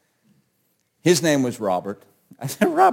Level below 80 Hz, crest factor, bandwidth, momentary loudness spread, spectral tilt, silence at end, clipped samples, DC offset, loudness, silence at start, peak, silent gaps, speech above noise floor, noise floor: -68 dBFS; 20 dB; 17 kHz; 17 LU; -4.5 dB/octave; 0 s; under 0.1%; under 0.1%; -21 LUFS; 1.05 s; -2 dBFS; none; 49 dB; -69 dBFS